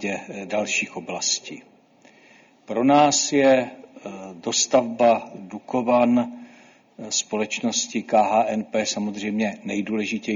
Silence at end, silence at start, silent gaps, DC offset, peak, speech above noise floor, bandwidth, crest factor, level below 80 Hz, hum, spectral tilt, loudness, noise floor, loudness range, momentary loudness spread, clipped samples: 0 s; 0 s; none; under 0.1%; -6 dBFS; 32 dB; 7.6 kHz; 18 dB; -66 dBFS; none; -3 dB/octave; -22 LUFS; -54 dBFS; 3 LU; 19 LU; under 0.1%